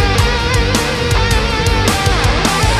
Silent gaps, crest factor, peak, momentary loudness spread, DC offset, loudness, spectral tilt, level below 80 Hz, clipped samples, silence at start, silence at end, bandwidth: none; 12 dB; 0 dBFS; 1 LU; under 0.1%; -14 LUFS; -4 dB/octave; -18 dBFS; under 0.1%; 0 s; 0 s; 15.5 kHz